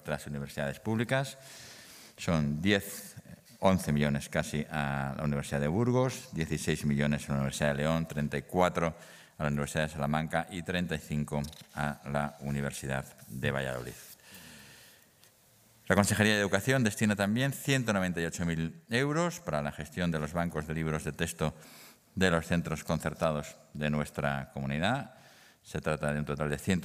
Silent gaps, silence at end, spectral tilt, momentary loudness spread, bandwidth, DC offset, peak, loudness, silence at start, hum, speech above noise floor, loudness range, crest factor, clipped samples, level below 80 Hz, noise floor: none; 0 s; -5.5 dB/octave; 16 LU; 16 kHz; under 0.1%; -8 dBFS; -32 LUFS; 0.05 s; none; 31 dB; 6 LU; 24 dB; under 0.1%; -54 dBFS; -63 dBFS